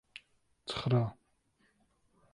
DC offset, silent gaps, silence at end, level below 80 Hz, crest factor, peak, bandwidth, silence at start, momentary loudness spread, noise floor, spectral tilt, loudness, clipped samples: under 0.1%; none; 1.2 s; -64 dBFS; 20 dB; -18 dBFS; 11 kHz; 0.65 s; 22 LU; -73 dBFS; -7 dB/octave; -34 LUFS; under 0.1%